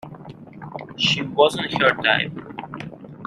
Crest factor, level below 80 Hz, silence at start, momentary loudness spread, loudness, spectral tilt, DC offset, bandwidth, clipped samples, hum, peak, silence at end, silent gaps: 20 dB; -58 dBFS; 0.05 s; 21 LU; -19 LUFS; -4 dB/octave; under 0.1%; 14 kHz; under 0.1%; none; -2 dBFS; 0 s; none